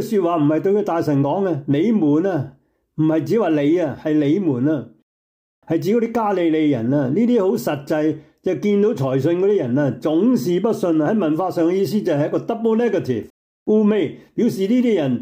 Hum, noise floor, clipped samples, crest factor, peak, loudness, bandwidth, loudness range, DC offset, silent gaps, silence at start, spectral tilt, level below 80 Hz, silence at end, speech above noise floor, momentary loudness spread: none; under -90 dBFS; under 0.1%; 10 dB; -8 dBFS; -19 LUFS; 16 kHz; 2 LU; under 0.1%; 5.03-5.62 s, 13.30-13.66 s; 0 s; -8 dB/octave; -64 dBFS; 0 s; over 72 dB; 6 LU